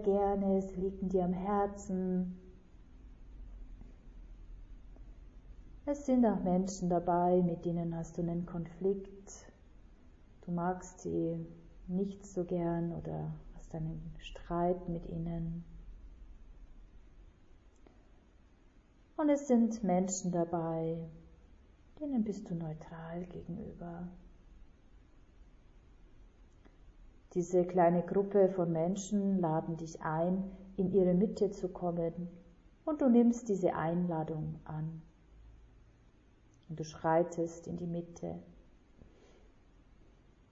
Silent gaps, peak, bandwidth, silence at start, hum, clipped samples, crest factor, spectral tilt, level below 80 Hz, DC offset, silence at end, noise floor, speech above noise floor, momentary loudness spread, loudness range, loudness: none; -16 dBFS; 7.6 kHz; 0 s; none; under 0.1%; 20 dB; -8.5 dB/octave; -56 dBFS; under 0.1%; 1.9 s; -63 dBFS; 30 dB; 20 LU; 13 LU; -34 LUFS